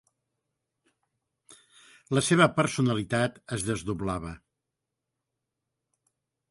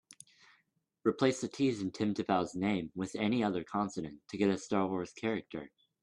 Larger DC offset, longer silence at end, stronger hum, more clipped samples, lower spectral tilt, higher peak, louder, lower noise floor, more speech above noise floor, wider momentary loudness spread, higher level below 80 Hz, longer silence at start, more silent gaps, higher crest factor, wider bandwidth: neither; first, 2.15 s vs 0.35 s; neither; neither; about the same, -5 dB/octave vs -6 dB/octave; first, -6 dBFS vs -16 dBFS; first, -27 LUFS vs -34 LUFS; first, -86 dBFS vs -77 dBFS; first, 59 dB vs 43 dB; first, 11 LU vs 8 LU; first, -56 dBFS vs -70 dBFS; first, 2.1 s vs 1.05 s; neither; about the same, 24 dB vs 20 dB; about the same, 11.5 kHz vs 11.5 kHz